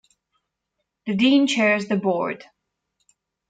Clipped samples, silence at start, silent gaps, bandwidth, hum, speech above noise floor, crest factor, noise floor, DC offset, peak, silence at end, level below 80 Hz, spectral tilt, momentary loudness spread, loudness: under 0.1%; 1.05 s; none; 9.2 kHz; none; 59 dB; 16 dB; -79 dBFS; under 0.1%; -8 dBFS; 1.15 s; -70 dBFS; -5 dB/octave; 14 LU; -20 LUFS